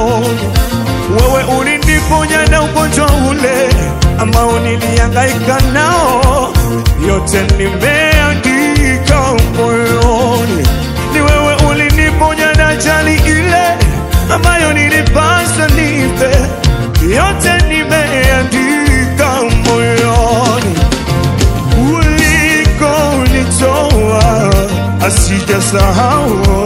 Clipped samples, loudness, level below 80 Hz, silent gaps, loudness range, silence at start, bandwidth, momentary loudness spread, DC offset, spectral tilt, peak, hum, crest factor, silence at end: 0.7%; -10 LUFS; -16 dBFS; none; 1 LU; 0 s; 16.5 kHz; 3 LU; 0.2%; -5 dB/octave; 0 dBFS; none; 10 dB; 0 s